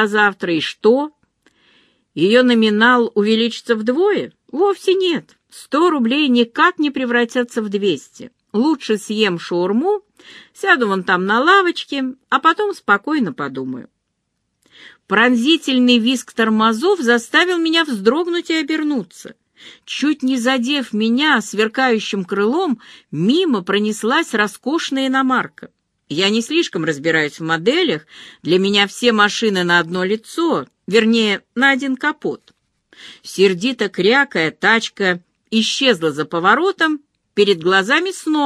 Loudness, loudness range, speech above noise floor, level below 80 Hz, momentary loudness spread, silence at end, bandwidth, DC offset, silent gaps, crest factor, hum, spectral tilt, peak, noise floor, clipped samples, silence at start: -16 LUFS; 3 LU; 56 dB; -68 dBFS; 9 LU; 0 s; 13 kHz; under 0.1%; none; 18 dB; none; -4 dB/octave; 0 dBFS; -72 dBFS; under 0.1%; 0 s